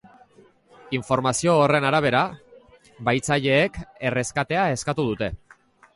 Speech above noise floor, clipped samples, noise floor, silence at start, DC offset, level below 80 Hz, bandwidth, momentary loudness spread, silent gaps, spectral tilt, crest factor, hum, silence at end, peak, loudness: 33 dB; under 0.1%; -55 dBFS; 0.85 s; under 0.1%; -50 dBFS; 11.5 kHz; 10 LU; none; -4.5 dB/octave; 18 dB; none; 0.6 s; -6 dBFS; -22 LUFS